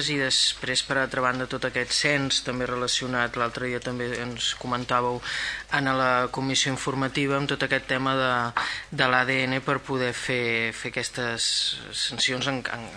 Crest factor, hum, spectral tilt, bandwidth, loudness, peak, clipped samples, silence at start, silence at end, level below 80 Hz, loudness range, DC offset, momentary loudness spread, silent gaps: 22 dB; none; -3 dB/octave; 11 kHz; -25 LUFS; -4 dBFS; under 0.1%; 0 s; 0 s; -54 dBFS; 2 LU; under 0.1%; 7 LU; none